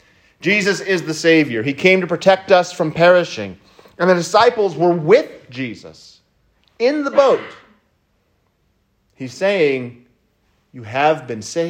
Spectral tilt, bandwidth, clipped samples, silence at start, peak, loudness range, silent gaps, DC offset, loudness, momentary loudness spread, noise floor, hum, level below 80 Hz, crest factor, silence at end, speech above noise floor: -5 dB/octave; 16 kHz; under 0.1%; 0.4 s; 0 dBFS; 7 LU; none; under 0.1%; -16 LUFS; 15 LU; -63 dBFS; none; -62 dBFS; 18 dB; 0 s; 47 dB